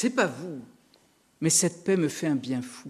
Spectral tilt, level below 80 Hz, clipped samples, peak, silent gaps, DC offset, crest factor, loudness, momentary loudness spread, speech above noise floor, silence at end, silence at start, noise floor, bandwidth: -4 dB/octave; -72 dBFS; under 0.1%; -8 dBFS; none; under 0.1%; 20 dB; -26 LUFS; 16 LU; 36 dB; 0 s; 0 s; -63 dBFS; 13.5 kHz